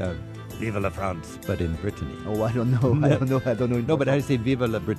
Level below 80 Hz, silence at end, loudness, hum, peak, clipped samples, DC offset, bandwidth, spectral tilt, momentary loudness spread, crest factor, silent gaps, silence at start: -44 dBFS; 0 s; -25 LUFS; none; -8 dBFS; under 0.1%; under 0.1%; 13.5 kHz; -7.5 dB/octave; 11 LU; 16 dB; none; 0 s